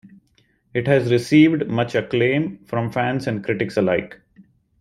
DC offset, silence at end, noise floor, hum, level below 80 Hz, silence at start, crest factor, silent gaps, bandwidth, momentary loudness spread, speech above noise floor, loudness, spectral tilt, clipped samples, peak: under 0.1%; 0.65 s; -62 dBFS; none; -56 dBFS; 0.75 s; 18 dB; none; 12 kHz; 11 LU; 43 dB; -20 LUFS; -7 dB/octave; under 0.1%; -2 dBFS